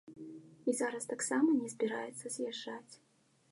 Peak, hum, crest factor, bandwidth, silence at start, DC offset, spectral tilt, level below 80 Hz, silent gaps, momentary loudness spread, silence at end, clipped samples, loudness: -20 dBFS; none; 18 dB; 11.5 kHz; 0.05 s; under 0.1%; -3 dB/octave; -88 dBFS; none; 19 LU; 0.55 s; under 0.1%; -36 LUFS